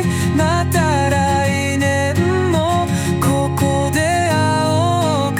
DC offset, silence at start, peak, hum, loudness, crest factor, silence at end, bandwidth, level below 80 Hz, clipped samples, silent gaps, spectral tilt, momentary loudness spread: under 0.1%; 0 s; -4 dBFS; none; -16 LUFS; 12 dB; 0 s; 17.5 kHz; -42 dBFS; under 0.1%; none; -5.5 dB/octave; 2 LU